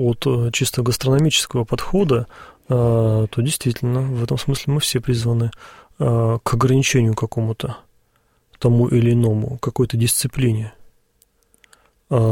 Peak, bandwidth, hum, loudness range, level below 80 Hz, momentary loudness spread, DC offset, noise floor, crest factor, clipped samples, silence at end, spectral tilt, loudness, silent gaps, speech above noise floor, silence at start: -4 dBFS; 16.5 kHz; none; 2 LU; -42 dBFS; 7 LU; under 0.1%; -62 dBFS; 14 dB; under 0.1%; 0 s; -5.5 dB/octave; -19 LUFS; none; 44 dB; 0 s